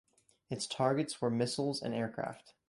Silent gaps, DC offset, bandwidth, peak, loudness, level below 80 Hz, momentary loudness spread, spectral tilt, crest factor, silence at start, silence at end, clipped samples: none; under 0.1%; 11.5 kHz; -16 dBFS; -35 LUFS; -72 dBFS; 10 LU; -5 dB/octave; 20 dB; 0.5 s; 0.2 s; under 0.1%